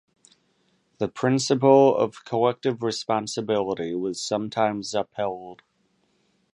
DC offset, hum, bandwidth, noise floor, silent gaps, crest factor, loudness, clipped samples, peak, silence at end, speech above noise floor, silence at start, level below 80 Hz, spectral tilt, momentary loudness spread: under 0.1%; none; 11.5 kHz; -68 dBFS; none; 22 dB; -24 LUFS; under 0.1%; -4 dBFS; 1 s; 45 dB; 1 s; -66 dBFS; -5 dB/octave; 13 LU